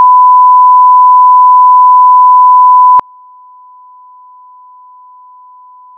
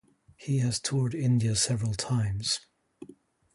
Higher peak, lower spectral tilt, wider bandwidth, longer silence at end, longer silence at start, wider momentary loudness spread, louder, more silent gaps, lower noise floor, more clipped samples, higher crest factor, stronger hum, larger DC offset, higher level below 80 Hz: first, 0 dBFS vs -14 dBFS; first, -6 dB/octave vs -4.5 dB/octave; second, 1.6 kHz vs 11.5 kHz; first, 3 s vs 0.5 s; second, 0 s vs 0.4 s; second, 0 LU vs 6 LU; first, -3 LUFS vs -28 LUFS; neither; second, -36 dBFS vs -55 dBFS; neither; second, 6 dB vs 16 dB; neither; neither; second, -64 dBFS vs -54 dBFS